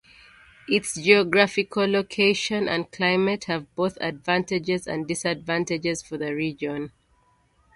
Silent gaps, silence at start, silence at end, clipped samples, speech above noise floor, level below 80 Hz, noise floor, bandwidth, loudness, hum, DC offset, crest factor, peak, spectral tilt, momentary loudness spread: none; 0.7 s; 0.85 s; under 0.1%; 39 dB; -60 dBFS; -63 dBFS; 11.5 kHz; -24 LUFS; none; under 0.1%; 22 dB; -2 dBFS; -4 dB/octave; 11 LU